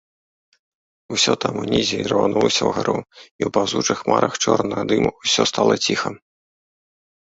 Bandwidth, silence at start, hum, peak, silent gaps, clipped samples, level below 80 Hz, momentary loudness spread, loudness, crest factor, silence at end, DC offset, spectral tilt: 8.2 kHz; 1.1 s; none; -2 dBFS; 3.31-3.39 s; under 0.1%; -52 dBFS; 6 LU; -19 LUFS; 20 dB; 1.1 s; under 0.1%; -3.5 dB/octave